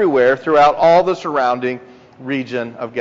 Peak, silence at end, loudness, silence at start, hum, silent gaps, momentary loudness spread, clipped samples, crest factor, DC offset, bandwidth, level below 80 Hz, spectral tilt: -2 dBFS; 0 s; -15 LUFS; 0 s; none; none; 13 LU; under 0.1%; 14 dB; under 0.1%; 7.6 kHz; -54 dBFS; -3.5 dB/octave